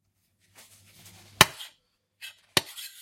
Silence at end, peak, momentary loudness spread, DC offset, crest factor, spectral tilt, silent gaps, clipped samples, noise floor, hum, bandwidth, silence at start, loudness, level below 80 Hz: 0.15 s; 0 dBFS; 23 LU; under 0.1%; 32 dB; -1.5 dB/octave; none; under 0.1%; -71 dBFS; none; 16.5 kHz; 1.4 s; -23 LUFS; -58 dBFS